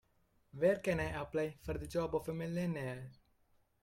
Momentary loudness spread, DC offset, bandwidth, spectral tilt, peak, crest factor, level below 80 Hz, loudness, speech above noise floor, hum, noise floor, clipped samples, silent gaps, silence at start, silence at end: 12 LU; under 0.1%; 16.5 kHz; -7 dB/octave; -20 dBFS; 18 dB; -58 dBFS; -38 LUFS; 37 dB; none; -74 dBFS; under 0.1%; none; 0.55 s; 0.7 s